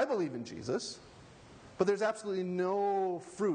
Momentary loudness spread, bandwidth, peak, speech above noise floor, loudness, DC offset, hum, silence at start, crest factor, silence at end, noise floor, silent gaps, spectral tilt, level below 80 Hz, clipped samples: 14 LU; 9.8 kHz; -14 dBFS; 21 dB; -34 LUFS; under 0.1%; none; 0 s; 20 dB; 0 s; -55 dBFS; none; -5.5 dB/octave; -68 dBFS; under 0.1%